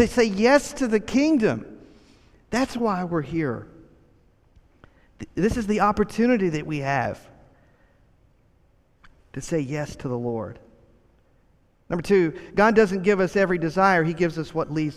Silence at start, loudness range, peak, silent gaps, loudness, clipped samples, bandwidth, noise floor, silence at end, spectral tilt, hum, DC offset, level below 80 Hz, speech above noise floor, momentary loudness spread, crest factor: 0 s; 11 LU; -4 dBFS; none; -23 LUFS; under 0.1%; 14 kHz; -61 dBFS; 0 s; -6 dB/octave; none; under 0.1%; -48 dBFS; 39 dB; 13 LU; 20 dB